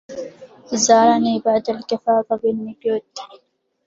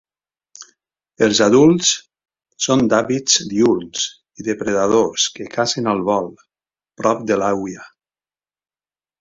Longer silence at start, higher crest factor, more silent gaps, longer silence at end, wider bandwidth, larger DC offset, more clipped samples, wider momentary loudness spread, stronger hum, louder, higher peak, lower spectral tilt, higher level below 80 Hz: second, 0.1 s vs 0.6 s; about the same, 18 dB vs 18 dB; neither; second, 0.5 s vs 1.35 s; about the same, 7.8 kHz vs 7.8 kHz; neither; neither; first, 20 LU vs 12 LU; neither; about the same, -18 LUFS vs -17 LUFS; about the same, -2 dBFS vs 0 dBFS; about the same, -3.5 dB/octave vs -3.5 dB/octave; second, -62 dBFS vs -56 dBFS